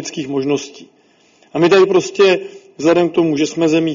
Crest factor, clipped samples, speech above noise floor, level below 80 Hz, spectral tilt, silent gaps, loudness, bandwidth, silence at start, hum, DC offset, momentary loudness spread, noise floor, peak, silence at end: 16 dB; under 0.1%; 38 dB; -60 dBFS; -4.5 dB/octave; none; -15 LUFS; 7.6 kHz; 0 s; none; under 0.1%; 10 LU; -52 dBFS; 0 dBFS; 0 s